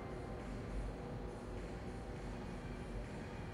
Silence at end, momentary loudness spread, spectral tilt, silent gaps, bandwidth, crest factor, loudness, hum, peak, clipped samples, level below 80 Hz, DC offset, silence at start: 0 s; 2 LU; -7 dB/octave; none; 11.5 kHz; 12 dB; -47 LUFS; none; -32 dBFS; under 0.1%; -50 dBFS; under 0.1%; 0 s